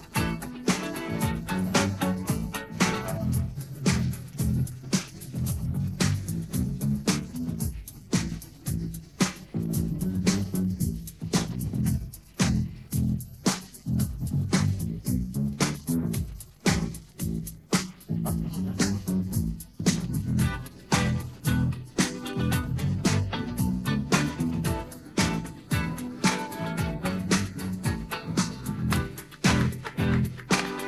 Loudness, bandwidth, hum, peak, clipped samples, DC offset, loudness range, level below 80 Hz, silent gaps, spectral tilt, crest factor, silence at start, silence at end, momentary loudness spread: -29 LUFS; 13.5 kHz; none; -8 dBFS; under 0.1%; under 0.1%; 2 LU; -42 dBFS; none; -5 dB/octave; 20 dB; 0 s; 0 s; 7 LU